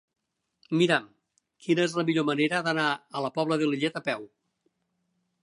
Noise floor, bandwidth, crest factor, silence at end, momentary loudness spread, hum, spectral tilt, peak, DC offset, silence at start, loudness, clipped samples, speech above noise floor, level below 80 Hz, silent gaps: -77 dBFS; 11.5 kHz; 22 dB; 1.15 s; 8 LU; none; -5.5 dB/octave; -8 dBFS; under 0.1%; 0.7 s; -27 LUFS; under 0.1%; 50 dB; -78 dBFS; none